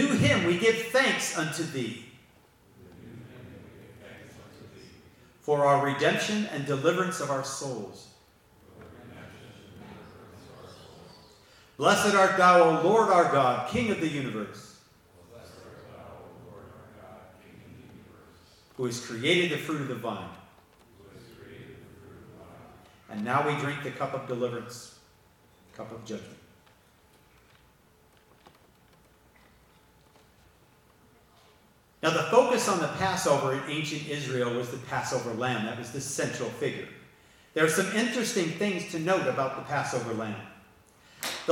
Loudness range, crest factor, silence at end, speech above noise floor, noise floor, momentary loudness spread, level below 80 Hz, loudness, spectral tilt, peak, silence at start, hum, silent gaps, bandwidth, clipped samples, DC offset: 24 LU; 22 dB; 0 s; 34 dB; -61 dBFS; 26 LU; -66 dBFS; -27 LUFS; -4.5 dB/octave; -8 dBFS; 0 s; none; none; 18 kHz; under 0.1%; under 0.1%